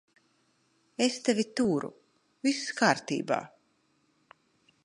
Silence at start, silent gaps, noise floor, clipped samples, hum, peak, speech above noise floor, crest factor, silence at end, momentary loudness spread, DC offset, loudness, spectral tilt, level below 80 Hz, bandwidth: 1 s; none; -71 dBFS; under 0.1%; none; -6 dBFS; 43 dB; 26 dB; 1.4 s; 11 LU; under 0.1%; -29 LUFS; -4 dB/octave; -76 dBFS; 11.5 kHz